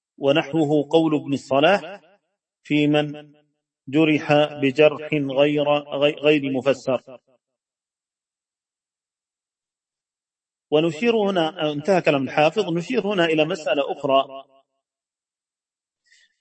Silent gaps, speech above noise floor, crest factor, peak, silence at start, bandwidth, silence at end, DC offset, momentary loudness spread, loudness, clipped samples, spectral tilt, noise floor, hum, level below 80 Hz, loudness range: none; over 70 dB; 20 dB; -2 dBFS; 0.2 s; 8.6 kHz; 2 s; under 0.1%; 6 LU; -20 LUFS; under 0.1%; -6 dB/octave; under -90 dBFS; none; -70 dBFS; 7 LU